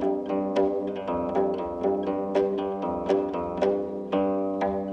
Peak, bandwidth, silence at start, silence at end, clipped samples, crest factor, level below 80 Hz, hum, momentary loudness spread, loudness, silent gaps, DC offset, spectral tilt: -10 dBFS; 7.2 kHz; 0 s; 0 s; under 0.1%; 16 dB; -56 dBFS; none; 4 LU; -27 LUFS; none; under 0.1%; -8 dB/octave